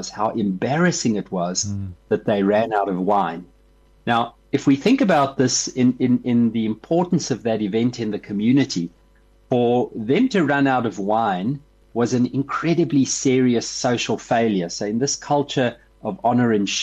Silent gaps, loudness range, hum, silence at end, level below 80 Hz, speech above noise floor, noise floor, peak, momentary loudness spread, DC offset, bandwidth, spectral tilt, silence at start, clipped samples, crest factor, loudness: none; 3 LU; none; 0 s; -56 dBFS; 34 dB; -54 dBFS; -6 dBFS; 7 LU; under 0.1%; 8.6 kHz; -5 dB/octave; 0 s; under 0.1%; 14 dB; -20 LUFS